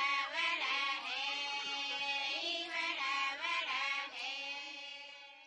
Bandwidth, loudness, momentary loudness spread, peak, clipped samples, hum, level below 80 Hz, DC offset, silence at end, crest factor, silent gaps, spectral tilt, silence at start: 11 kHz; -36 LUFS; 9 LU; -22 dBFS; under 0.1%; none; -86 dBFS; under 0.1%; 0 s; 16 dB; none; 1 dB/octave; 0 s